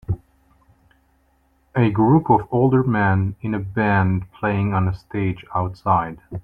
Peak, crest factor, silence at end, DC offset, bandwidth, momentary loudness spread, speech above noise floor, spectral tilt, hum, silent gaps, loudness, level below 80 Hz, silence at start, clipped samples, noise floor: -2 dBFS; 18 dB; 0.05 s; under 0.1%; 5.2 kHz; 9 LU; 42 dB; -10.5 dB/octave; none; none; -20 LUFS; -46 dBFS; 0.1 s; under 0.1%; -61 dBFS